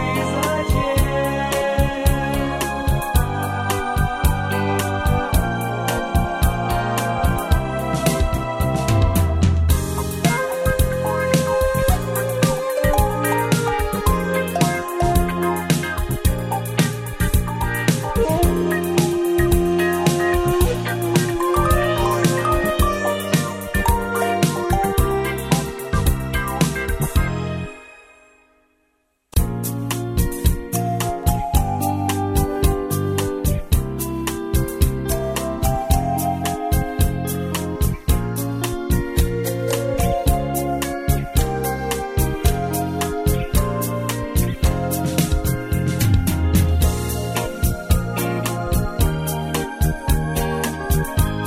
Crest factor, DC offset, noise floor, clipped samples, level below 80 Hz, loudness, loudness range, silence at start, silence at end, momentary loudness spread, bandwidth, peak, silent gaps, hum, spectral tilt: 16 dB; under 0.1%; -67 dBFS; under 0.1%; -26 dBFS; -20 LUFS; 3 LU; 0 s; 0 s; 5 LU; 16 kHz; -2 dBFS; none; none; -5.5 dB/octave